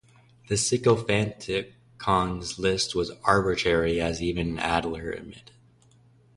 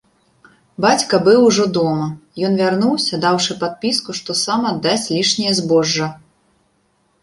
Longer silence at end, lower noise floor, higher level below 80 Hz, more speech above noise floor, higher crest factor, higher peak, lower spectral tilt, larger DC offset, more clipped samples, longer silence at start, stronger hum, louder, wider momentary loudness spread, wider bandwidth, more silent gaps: about the same, 0.95 s vs 1.05 s; second, -58 dBFS vs -62 dBFS; first, -46 dBFS vs -58 dBFS; second, 33 dB vs 46 dB; first, 24 dB vs 16 dB; second, -4 dBFS vs 0 dBFS; about the same, -4.5 dB/octave vs -4 dB/octave; neither; neither; second, 0.5 s vs 0.8 s; neither; second, -26 LUFS vs -16 LUFS; about the same, 10 LU vs 8 LU; about the same, 11.5 kHz vs 11.5 kHz; neither